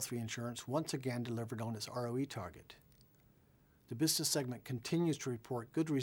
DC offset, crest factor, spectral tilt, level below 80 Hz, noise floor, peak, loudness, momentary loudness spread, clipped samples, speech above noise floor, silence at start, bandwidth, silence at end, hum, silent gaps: under 0.1%; 18 dB; -4.5 dB/octave; -72 dBFS; -69 dBFS; -22 dBFS; -38 LUFS; 11 LU; under 0.1%; 30 dB; 0 s; 19.5 kHz; 0 s; none; none